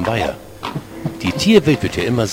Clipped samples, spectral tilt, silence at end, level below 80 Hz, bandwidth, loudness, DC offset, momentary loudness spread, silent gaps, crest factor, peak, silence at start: under 0.1%; -5.5 dB/octave; 0 s; -40 dBFS; 16.5 kHz; -17 LUFS; under 0.1%; 15 LU; none; 18 dB; 0 dBFS; 0 s